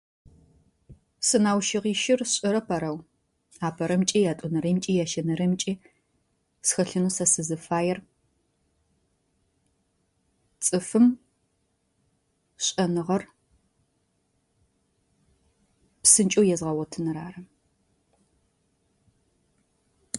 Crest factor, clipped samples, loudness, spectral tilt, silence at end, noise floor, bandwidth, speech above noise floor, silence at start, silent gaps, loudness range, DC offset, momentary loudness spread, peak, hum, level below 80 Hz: 24 dB; under 0.1%; -24 LUFS; -4 dB/octave; 0 s; -73 dBFS; 12 kHz; 48 dB; 0.9 s; none; 8 LU; under 0.1%; 10 LU; -4 dBFS; none; -64 dBFS